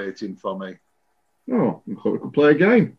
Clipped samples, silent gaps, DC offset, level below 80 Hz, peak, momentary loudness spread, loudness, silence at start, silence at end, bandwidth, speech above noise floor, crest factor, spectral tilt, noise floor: under 0.1%; none; under 0.1%; -66 dBFS; -4 dBFS; 15 LU; -21 LUFS; 0 s; 0.1 s; 6.6 kHz; 51 dB; 18 dB; -8.5 dB/octave; -71 dBFS